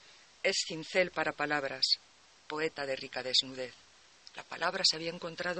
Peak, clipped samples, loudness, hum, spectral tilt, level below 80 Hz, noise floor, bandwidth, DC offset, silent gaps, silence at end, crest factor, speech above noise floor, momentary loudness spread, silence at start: -14 dBFS; under 0.1%; -32 LUFS; none; -2 dB/octave; -74 dBFS; -59 dBFS; 8.4 kHz; under 0.1%; none; 0 s; 22 dB; 25 dB; 14 LU; 0.05 s